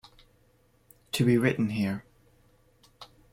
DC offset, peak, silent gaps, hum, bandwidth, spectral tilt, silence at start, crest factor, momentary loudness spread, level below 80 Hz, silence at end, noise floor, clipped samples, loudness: under 0.1%; -10 dBFS; none; none; 16.5 kHz; -6 dB/octave; 1.15 s; 20 dB; 27 LU; -62 dBFS; 0.3 s; -65 dBFS; under 0.1%; -27 LUFS